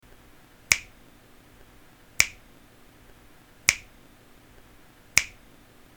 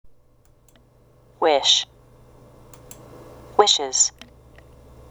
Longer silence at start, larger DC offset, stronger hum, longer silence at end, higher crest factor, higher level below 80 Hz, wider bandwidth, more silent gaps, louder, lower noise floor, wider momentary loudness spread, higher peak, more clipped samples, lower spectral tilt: first, 0.7 s vs 0.05 s; neither; neither; second, 0.7 s vs 1 s; first, 32 dB vs 26 dB; about the same, -56 dBFS vs -54 dBFS; about the same, 19.5 kHz vs over 20 kHz; neither; second, -25 LUFS vs -18 LUFS; about the same, -53 dBFS vs -56 dBFS; second, 4 LU vs 12 LU; about the same, 0 dBFS vs 0 dBFS; neither; about the same, 1 dB/octave vs 0 dB/octave